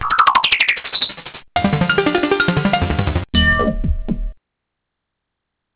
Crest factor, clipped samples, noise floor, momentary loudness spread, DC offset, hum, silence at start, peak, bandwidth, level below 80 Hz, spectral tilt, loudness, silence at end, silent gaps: 18 dB; under 0.1%; -78 dBFS; 11 LU; under 0.1%; none; 0 s; 0 dBFS; 4 kHz; -28 dBFS; -9 dB/octave; -16 LUFS; 1.4 s; none